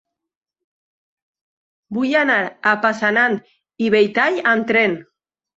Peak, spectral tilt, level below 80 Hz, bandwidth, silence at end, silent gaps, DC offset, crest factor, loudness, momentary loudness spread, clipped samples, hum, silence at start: -2 dBFS; -5.5 dB/octave; -66 dBFS; 8 kHz; 0.55 s; none; under 0.1%; 18 dB; -17 LUFS; 8 LU; under 0.1%; none; 1.9 s